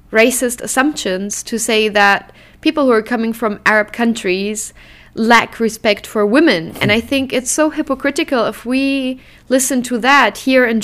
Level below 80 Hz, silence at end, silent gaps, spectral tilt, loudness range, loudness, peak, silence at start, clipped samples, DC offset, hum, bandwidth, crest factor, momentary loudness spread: -46 dBFS; 0 s; none; -3 dB/octave; 2 LU; -15 LUFS; 0 dBFS; 0.1 s; under 0.1%; under 0.1%; none; 16 kHz; 14 dB; 8 LU